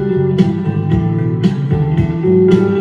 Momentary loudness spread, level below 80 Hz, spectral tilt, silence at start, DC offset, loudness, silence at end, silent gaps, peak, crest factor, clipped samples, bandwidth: 5 LU; -36 dBFS; -9.5 dB/octave; 0 s; under 0.1%; -14 LUFS; 0 s; none; 0 dBFS; 12 dB; under 0.1%; 7.4 kHz